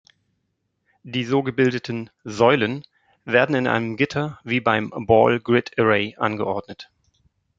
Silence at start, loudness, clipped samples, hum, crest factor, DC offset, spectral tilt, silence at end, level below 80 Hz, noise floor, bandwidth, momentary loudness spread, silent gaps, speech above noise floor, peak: 1.05 s; -21 LUFS; under 0.1%; none; 20 dB; under 0.1%; -6.5 dB/octave; 0.75 s; -58 dBFS; -74 dBFS; 7.8 kHz; 13 LU; none; 53 dB; -2 dBFS